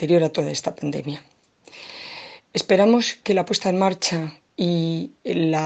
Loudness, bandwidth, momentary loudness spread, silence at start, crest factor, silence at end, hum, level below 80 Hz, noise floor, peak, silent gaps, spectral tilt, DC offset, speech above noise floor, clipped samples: -22 LUFS; 8.8 kHz; 18 LU; 0 s; 18 dB; 0 s; none; -64 dBFS; -46 dBFS; -4 dBFS; none; -5 dB/octave; under 0.1%; 25 dB; under 0.1%